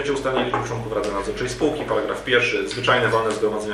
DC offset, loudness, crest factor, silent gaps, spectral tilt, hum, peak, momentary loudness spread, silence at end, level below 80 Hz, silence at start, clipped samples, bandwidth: under 0.1%; -22 LUFS; 18 dB; none; -4.5 dB/octave; none; -4 dBFS; 7 LU; 0 s; -44 dBFS; 0 s; under 0.1%; 14 kHz